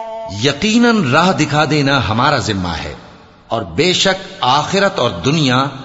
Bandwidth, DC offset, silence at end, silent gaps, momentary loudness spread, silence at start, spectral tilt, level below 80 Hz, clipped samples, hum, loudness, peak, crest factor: 8 kHz; under 0.1%; 0 s; none; 10 LU; 0 s; -4.5 dB/octave; -42 dBFS; under 0.1%; none; -14 LUFS; 0 dBFS; 14 dB